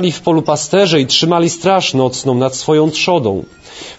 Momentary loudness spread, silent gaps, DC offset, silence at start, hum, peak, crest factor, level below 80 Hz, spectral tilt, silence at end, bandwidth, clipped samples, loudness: 6 LU; none; under 0.1%; 0 s; none; 0 dBFS; 14 dB; -50 dBFS; -4.5 dB/octave; 0.05 s; 8 kHz; under 0.1%; -13 LUFS